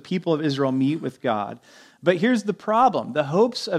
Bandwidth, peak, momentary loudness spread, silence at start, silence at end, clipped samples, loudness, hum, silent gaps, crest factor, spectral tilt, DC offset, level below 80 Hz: 12 kHz; -4 dBFS; 7 LU; 0.05 s; 0 s; under 0.1%; -22 LUFS; none; none; 18 dB; -6.5 dB/octave; under 0.1%; -72 dBFS